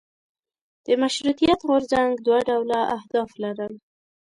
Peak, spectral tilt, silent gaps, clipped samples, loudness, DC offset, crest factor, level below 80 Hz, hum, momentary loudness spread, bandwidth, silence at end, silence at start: -8 dBFS; -4.5 dB/octave; none; under 0.1%; -22 LUFS; under 0.1%; 16 dB; -56 dBFS; none; 10 LU; 11.5 kHz; 0.55 s; 0.9 s